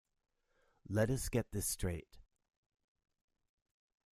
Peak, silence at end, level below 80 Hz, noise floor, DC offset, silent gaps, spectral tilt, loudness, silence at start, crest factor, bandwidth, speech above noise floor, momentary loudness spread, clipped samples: -18 dBFS; 1.95 s; -54 dBFS; -77 dBFS; under 0.1%; none; -5 dB/octave; -38 LUFS; 0.9 s; 24 dB; 15.5 kHz; 39 dB; 7 LU; under 0.1%